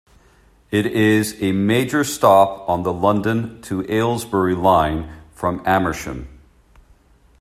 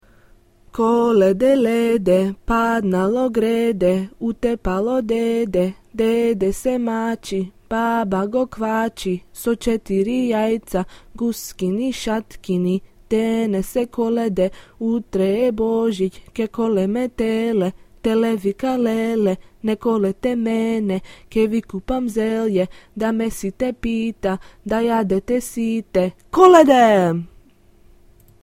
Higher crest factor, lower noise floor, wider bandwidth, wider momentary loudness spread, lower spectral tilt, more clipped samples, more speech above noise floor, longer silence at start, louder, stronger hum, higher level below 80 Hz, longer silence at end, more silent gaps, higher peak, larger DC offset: about the same, 18 dB vs 20 dB; about the same, -53 dBFS vs -51 dBFS; second, 14 kHz vs 16 kHz; first, 12 LU vs 9 LU; about the same, -5.5 dB/octave vs -6.5 dB/octave; neither; about the same, 35 dB vs 33 dB; about the same, 0.7 s vs 0.75 s; about the same, -18 LUFS vs -20 LUFS; neither; about the same, -44 dBFS vs -42 dBFS; about the same, 1.15 s vs 1.15 s; neither; about the same, 0 dBFS vs 0 dBFS; second, under 0.1% vs 0.1%